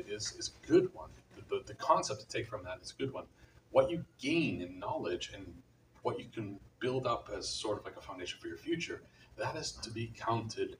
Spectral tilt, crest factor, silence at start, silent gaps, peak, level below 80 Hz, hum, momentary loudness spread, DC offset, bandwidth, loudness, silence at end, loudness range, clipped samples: -4.5 dB/octave; 22 dB; 0 s; none; -14 dBFS; -62 dBFS; none; 15 LU; under 0.1%; 15.5 kHz; -37 LUFS; 0.05 s; 4 LU; under 0.1%